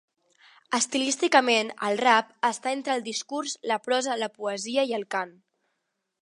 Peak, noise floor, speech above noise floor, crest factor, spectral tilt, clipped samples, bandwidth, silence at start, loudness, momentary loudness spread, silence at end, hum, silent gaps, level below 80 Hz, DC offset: -4 dBFS; -80 dBFS; 54 dB; 24 dB; -1.5 dB/octave; under 0.1%; 11.5 kHz; 0.7 s; -26 LUFS; 10 LU; 0.9 s; none; none; -82 dBFS; under 0.1%